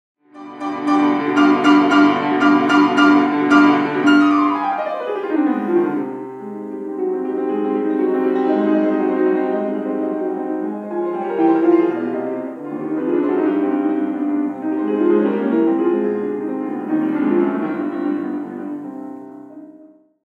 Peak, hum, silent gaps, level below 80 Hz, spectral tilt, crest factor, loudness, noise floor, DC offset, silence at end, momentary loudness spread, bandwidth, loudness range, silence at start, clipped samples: 0 dBFS; none; none; -74 dBFS; -6.5 dB/octave; 18 dB; -17 LUFS; -46 dBFS; under 0.1%; 0.45 s; 14 LU; 7.8 kHz; 7 LU; 0.35 s; under 0.1%